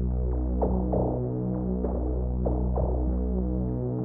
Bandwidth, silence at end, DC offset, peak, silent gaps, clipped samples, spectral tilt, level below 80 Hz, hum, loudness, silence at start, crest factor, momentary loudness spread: 1.8 kHz; 0 s; under 0.1%; -14 dBFS; none; under 0.1%; -12 dB/octave; -30 dBFS; none; -28 LUFS; 0 s; 12 dB; 3 LU